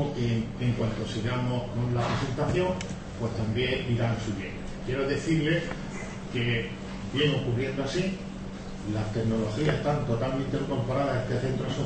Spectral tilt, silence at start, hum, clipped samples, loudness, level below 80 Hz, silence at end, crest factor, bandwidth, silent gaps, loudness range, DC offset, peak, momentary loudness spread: -6.5 dB/octave; 0 s; none; under 0.1%; -29 LUFS; -44 dBFS; 0 s; 18 dB; 8.8 kHz; none; 1 LU; under 0.1%; -12 dBFS; 10 LU